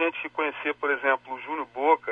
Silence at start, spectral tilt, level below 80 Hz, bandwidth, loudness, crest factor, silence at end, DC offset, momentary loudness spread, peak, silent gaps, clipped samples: 0 s; -5 dB/octave; -74 dBFS; 4.9 kHz; -27 LUFS; 18 dB; 0 s; under 0.1%; 9 LU; -8 dBFS; none; under 0.1%